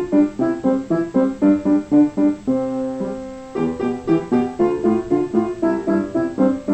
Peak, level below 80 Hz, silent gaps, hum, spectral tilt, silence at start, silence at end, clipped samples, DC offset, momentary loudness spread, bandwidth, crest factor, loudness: -4 dBFS; -48 dBFS; none; none; -8.5 dB/octave; 0 s; 0 s; under 0.1%; under 0.1%; 7 LU; 8.4 kHz; 14 dB; -19 LUFS